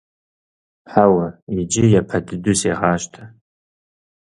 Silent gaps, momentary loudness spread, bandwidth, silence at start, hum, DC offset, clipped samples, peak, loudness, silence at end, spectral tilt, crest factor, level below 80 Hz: 1.42-1.47 s; 10 LU; 11.5 kHz; 0.9 s; none; under 0.1%; under 0.1%; 0 dBFS; -18 LUFS; 0.95 s; -5.5 dB/octave; 20 dB; -46 dBFS